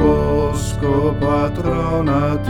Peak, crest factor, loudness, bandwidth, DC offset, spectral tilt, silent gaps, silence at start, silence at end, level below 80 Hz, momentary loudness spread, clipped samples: -4 dBFS; 14 dB; -18 LUFS; 17 kHz; 0.3%; -7.5 dB/octave; none; 0 s; 0 s; -28 dBFS; 3 LU; under 0.1%